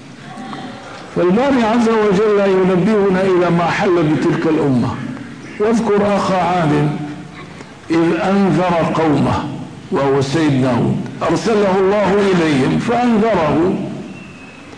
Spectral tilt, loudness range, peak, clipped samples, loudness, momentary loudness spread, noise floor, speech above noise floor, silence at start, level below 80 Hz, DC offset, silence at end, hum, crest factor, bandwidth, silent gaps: -7 dB/octave; 3 LU; -6 dBFS; under 0.1%; -15 LUFS; 16 LU; -35 dBFS; 21 dB; 0 s; -44 dBFS; 0.3%; 0 s; none; 10 dB; 10.5 kHz; none